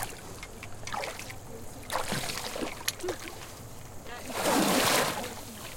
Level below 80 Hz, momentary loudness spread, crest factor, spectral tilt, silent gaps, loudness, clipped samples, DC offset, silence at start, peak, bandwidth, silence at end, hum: -50 dBFS; 19 LU; 24 dB; -2.5 dB/octave; none; -31 LUFS; under 0.1%; under 0.1%; 0 s; -8 dBFS; 17 kHz; 0 s; none